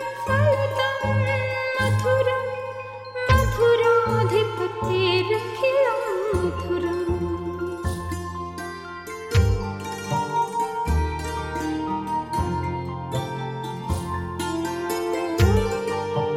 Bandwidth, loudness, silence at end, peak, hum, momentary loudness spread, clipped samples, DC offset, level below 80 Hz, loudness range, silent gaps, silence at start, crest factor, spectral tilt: 16 kHz; -24 LUFS; 0 s; -6 dBFS; none; 11 LU; under 0.1%; under 0.1%; -36 dBFS; 6 LU; none; 0 s; 18 dB; -6 dB/octave